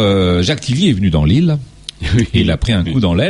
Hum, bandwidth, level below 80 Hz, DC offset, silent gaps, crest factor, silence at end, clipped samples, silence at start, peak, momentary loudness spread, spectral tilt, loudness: none; 11 kHz; -26 dBFS; under 0.1%; none; 12 dB; 0 s; under 0.1%; 0 s; -2 dBFS; 6 LU; -6.5 dB/octave; -14 LUFS